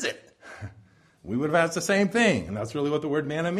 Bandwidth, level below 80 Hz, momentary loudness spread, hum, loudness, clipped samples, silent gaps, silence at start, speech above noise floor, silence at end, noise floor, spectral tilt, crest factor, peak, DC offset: 15 kHz; -58 dBFS; 20 LU; none; -25 LUFS; under 0.1%; none; 0 s; 32 dB; 0 s; -56 dBFS; -5 dB/octave; 18 dB; -8 dBFS; under 0.1%